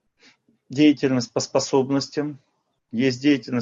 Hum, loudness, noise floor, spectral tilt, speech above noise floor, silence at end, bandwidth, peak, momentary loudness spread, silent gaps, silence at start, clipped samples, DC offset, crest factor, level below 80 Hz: none; -22 LUFS; -58 dBFS; -5 dB/octave; 37 dB; 0 s; 7.6 kHz; -4 dBFS; 12 LU; none; 0.7 s; under 0.1%; under 0.1%; 18 dB; -68 dBFS